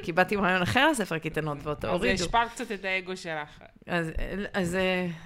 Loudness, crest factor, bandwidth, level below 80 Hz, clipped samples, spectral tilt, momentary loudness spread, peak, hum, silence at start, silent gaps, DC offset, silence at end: -28 LUFS; 20 dB; 16 kHz; -44 dBFS; under 0.1%; -4.5 dB/octave; 11 LU; -8 dBFS; none; 0 s; none; under 0.1%; 0 s